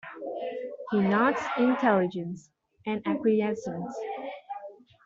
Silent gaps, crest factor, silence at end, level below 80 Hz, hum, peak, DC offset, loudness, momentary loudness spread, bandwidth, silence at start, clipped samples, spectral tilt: none; 18 dB; 0.3 s; -70 dBFS; none; -10 dBFS; under 0.1%; -28 LUFS; 16 LU; 7.6 kHz; 0.05 s; under 0.1%; -7 dB/octave